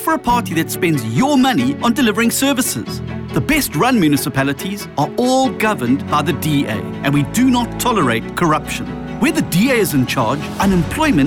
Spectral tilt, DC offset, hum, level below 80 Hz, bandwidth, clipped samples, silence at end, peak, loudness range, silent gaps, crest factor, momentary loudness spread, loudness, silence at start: -5 dB/octave; under 0.1%; none; -38 dBFS; 18.5 kHz; under 0.1%; 0 s; -6 dBFS; 1 LU; none; 10 dB; 7 LU; -16 LUFS; 0 s